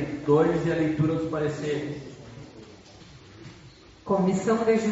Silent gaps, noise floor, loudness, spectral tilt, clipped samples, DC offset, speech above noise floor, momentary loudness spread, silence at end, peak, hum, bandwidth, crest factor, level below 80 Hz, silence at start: none; -50 dBFS; -25 LUFS; -7 dB/octave; under 0.1%; under 0.1%; 26 dB; 24 LU; 0 s; -10 dBFS; none; 8 kHz; 16 dB; -54 dBFS; 0 s